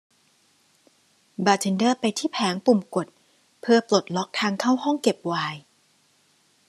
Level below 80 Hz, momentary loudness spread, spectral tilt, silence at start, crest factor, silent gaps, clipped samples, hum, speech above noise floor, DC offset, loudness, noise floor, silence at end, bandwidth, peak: -74 dBFS; 10 LU; -4.5 dB/octave; 1.4 s; 22 dB; none; under 0.1%; none; 41 dB; under 0.1%; -23 LUFS; -63 dBFS; 1.1 s; 13 kHz; -4 dBFS